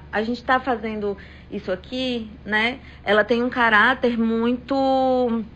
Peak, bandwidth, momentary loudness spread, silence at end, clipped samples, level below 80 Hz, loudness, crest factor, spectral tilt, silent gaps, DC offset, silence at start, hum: -4 dBFS; 8.4 kHz; 13 LU; 0 s; under 0.1%; -46 dBFS; -21 LUFS; 18 dB; -6 dB/octave; none; under 0.1%; 0 s; none